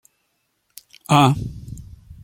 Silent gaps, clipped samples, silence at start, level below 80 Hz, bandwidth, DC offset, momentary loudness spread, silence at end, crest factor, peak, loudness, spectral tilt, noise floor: none; under 0.1%; 1.1 s; -44 dBFS; 16.5 kHz; under 0.1%; 24 LU; 0.1 s; 22 dB; -2 dBFS; -17 LUFS; -6 dB/octave; -70 dBFS